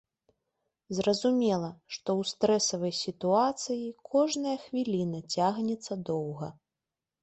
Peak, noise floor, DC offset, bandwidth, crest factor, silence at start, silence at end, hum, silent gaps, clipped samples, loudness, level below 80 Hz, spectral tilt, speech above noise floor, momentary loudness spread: -12 dBFS; -89 dBFS; under 0.1%; 8.4 kHz; 18 dB; 0.9 s; 0.7 s; none; none; under 0.1%; -30 LUFS; -70 dBFS; -4.5 dB/octave; 60 dB; 10 LU